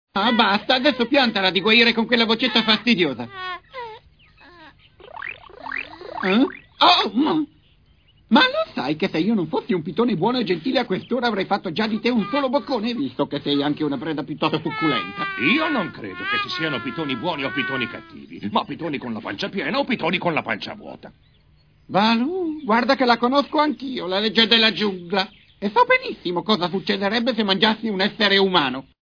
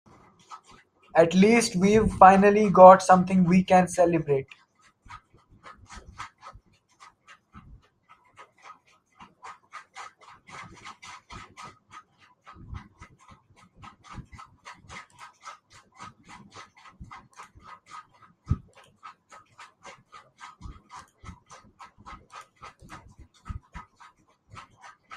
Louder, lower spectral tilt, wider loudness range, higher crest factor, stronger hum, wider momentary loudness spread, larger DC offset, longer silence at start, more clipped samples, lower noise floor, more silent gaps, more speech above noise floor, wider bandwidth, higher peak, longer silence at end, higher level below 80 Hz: about the same, -20 LUFS vs -19 LUFS; about the same, -5.5 dB/octave vs -6 dB/octave; second, 7 LU vs 29 LU; about the same, 20 dB vs 24 dB; neither; second, 13 LU vs 30 LU; neither; second, 0.15 s vs 0.5 s; neither; second, -56 dBFS vs -60 dBFS; neither; second, 36 dB vs 42 dB; second, 5.4 kHz vs 12 kHz; about the same, -2 dBFS vs -2 dBFS; second, 0.2 s vs 1.35 s; second, -58 dBFS vs -50 dBFS